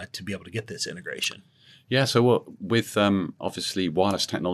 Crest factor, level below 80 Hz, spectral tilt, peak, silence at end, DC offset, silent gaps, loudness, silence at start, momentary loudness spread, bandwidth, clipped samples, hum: 20 dB; -70 dBFS; -4.5 dB/octave; -6 dBFS; 0 s; under 0.1%; none; -25 LUFS; 0 s; 12 LU; 13.5 kHz; under 0.1%; none